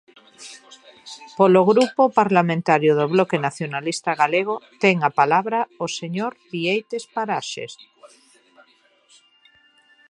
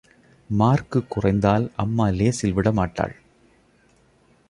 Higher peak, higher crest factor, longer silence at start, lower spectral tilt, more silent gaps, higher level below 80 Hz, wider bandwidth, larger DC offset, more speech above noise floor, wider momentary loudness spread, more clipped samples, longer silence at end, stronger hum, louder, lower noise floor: about the same, -2 dBFS vs -4 dBFS; about the same, 20 dB vs 20 dB; about the same, 0.4 s vs 0.5 s; second, -5.5 dB/octave vs -7 dB/octave; neither; second, -72 dBFS vs -42 dBFS; about the same, 11.5 kHz vs 11.5 kHz; neither; about the same, 38 dB vs 38 dB; first, 19 LU vs 7 LU; neither; first, 2.05 s vs 1.4 s; neither; about the same, -20 LUFS vs -22 LUFS; about the same, -58 dBFS vs -59 dBFS